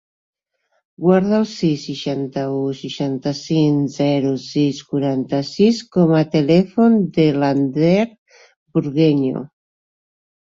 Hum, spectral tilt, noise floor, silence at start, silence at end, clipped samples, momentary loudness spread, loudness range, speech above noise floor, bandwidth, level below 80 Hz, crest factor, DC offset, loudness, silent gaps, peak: none; -7.5 dB/octave; -69 dBFS; 1 s; 0.95 s; under 0.1%; 9 LU; 4 LU; 52 dB; 7.6 kHz; -58 dBFS; 16 dB; under 0.1%; -18 LUFS; 8.18-8.26 s, 8.56-8.66 s; -2 dBFS